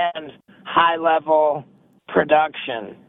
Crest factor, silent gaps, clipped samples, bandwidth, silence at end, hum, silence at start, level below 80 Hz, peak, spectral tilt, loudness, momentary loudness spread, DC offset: 18 dB; none; under 0.1%; 4 kHz; 0.15 s; none; 0 s; -62 dBFS; -2 dBFS; -8 dB/octave; -19 LUFS; 12 LU; under 0.1%